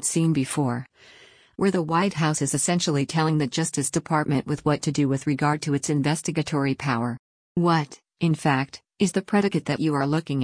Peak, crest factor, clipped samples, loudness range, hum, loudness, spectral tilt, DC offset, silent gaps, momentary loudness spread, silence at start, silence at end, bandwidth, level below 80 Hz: -8 dBFS; 16 dB; under 0.1%; 1 LU; none; -24 LUFS; -5 dB/octave; under 0.1%; 7.19-7.55 s; 5 LU; 0 s; 0 s; 10.5 kHz; -58 dBFS